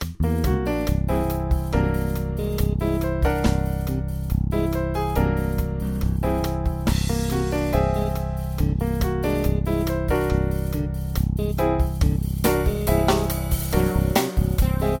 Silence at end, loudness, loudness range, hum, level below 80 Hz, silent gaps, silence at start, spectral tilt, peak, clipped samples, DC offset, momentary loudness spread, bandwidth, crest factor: 0 s; -23 LUFS; 2 LU; none; -26 dBFS; none; 0 s; -6.5 dB/octave; -6 dBFS; under 0.1%; under 0.1%; 5 LU; 18 kHz; 16 dB